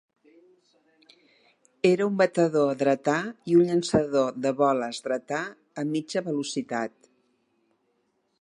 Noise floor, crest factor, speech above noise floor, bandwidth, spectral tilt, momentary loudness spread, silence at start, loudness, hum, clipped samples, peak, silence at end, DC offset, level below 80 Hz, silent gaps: -72 dBFS; 18 dB; 47 dB; 11 kHz; -5.5 dB/octave; 10 LU; 1.85 s; -25 LUFS; none; under 0.1%; -8 dBFS; 1.55 s; under 0.1%; -66 dBFS; none